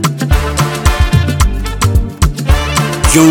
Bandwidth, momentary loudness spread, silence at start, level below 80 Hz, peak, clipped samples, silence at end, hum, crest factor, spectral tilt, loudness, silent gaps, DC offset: 19 kHz; 4 LU; 0 s; -14 dBFS; 0 dBFS; 0.3%; 0 s; none; 10 dB; -5 dB/octave; -12 LUFS; none; under 0.1%